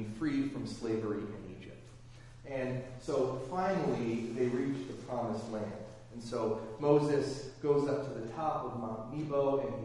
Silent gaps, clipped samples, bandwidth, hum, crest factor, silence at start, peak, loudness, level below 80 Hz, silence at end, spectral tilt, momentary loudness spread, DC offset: none; under 0.1%; 11.5 kHz; none; 20 dB; 0 s; -14 dBFS; -35 LUFS; -60 dBFS; 0 s; -7 dB/octave; 16 LU; under 0.1%